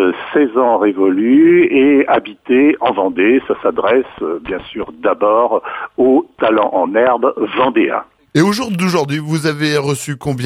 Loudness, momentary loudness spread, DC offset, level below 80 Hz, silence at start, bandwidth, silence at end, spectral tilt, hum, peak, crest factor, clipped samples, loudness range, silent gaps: -14 LUFS; 10 LU; under 0.1%; -52 dBFS; 0 s; 14.5 kHz; 0 s; -6 dB/octave; none; 0 dBFS; 14 dB; under 0.1%; 4 LU; none